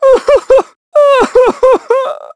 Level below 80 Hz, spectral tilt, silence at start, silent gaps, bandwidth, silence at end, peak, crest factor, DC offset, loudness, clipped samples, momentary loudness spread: -40 dBFS; -3.5 dB/octave; 0 s; 0.76-0.92 s; 11 kHz; 0.15 s; 0 dBFS; 8 dB; under 0.1%; -9 LUFS; 0.3%; 6 LU